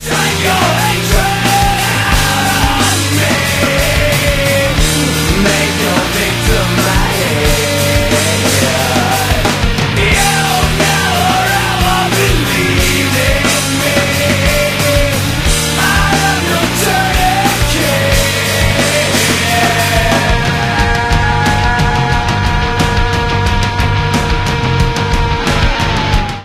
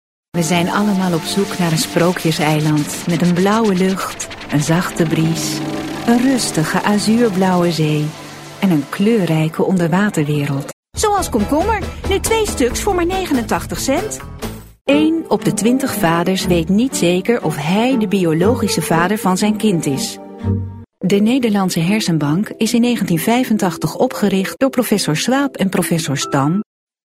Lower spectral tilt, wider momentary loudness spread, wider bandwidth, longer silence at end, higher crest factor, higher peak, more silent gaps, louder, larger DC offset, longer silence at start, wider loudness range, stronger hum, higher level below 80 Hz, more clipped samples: second, -3.5 dB/octave vs -5 dB/octave; second, 3 LU vs 7 LU; about the same, 16 kHz vs 16 kHz; second, 0 s vs 0.4 s; about the same, 12 dB vs 14 dB; about the same, 0 dBFS vs -2 dBFS; second, none vs 10.73-10.83 s, 14.81-14.85 s; first, -11 LUFS vs -16 LUFS; neither; second, 0 s vs 0.35 s; about the same, 2 LU vs 2 LU; neither; first, -20 dBFS vs -38 dBFS; neither